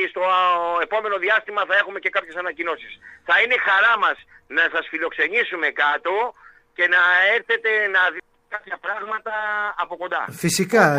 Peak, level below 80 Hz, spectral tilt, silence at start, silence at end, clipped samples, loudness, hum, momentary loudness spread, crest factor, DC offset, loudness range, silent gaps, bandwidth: -2 dBFS; -64 dBFS; -3 dB/octave; 0 s; 0 s; under 0.1%; -20 LUFS; none; 13 LU; 20 dB; under 0.1%; 3 LU; none; 15 kHz